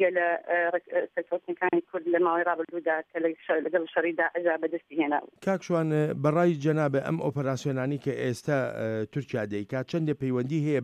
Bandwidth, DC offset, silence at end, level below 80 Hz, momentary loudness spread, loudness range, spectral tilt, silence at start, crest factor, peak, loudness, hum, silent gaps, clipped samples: 12 kHz; under 0.1%; 0 s; -70 dBFS; 7 LU; 3 LU; -7.5 dB/octave; 0 s; 16 dB; -12 dBFS; -28 LUFS; none; none; under 0.1%